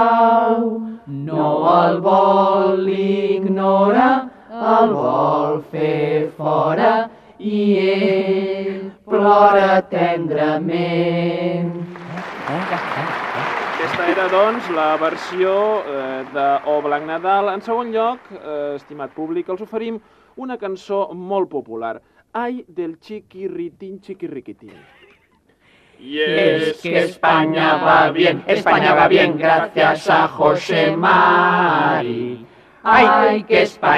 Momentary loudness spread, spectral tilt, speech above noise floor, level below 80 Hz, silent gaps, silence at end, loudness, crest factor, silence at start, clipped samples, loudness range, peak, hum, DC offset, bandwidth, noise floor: 16 LU; -6.5 dB/octave; 40 dB; -60 dBFS; none; 0 s; -17 LUFS; 16 dB; 0 s; under 0.1%; 11 LU; -2 dBFS; none; under 0.1%; 11.5 kHz; -57 dBFS